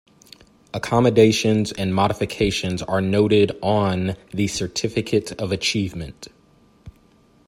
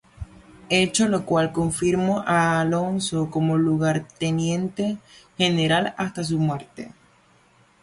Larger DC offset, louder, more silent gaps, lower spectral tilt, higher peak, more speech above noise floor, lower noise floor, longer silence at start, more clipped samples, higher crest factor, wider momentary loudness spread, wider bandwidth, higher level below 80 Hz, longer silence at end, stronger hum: neither; about the same, -20 LUFS vs -22 LUFS; neither; about the same, -5.5 dB/octave vs -5 dB/octave; first, -2 dBFS vs -6 dBFS; about the same, 35 dB vs 35 dB; about the same, -55 dBFS vs -58 dBFS; first, 0.75 s vs 0.2 s; neither; about the same, 20 dB vs 16 dB; second, 11 LU vs 17 LU; first, 16 kHz vs 11.5 kHz; about the same, -48 dBFS vs -52 dBFS; second, 0.6 s vs 0.95 s; neither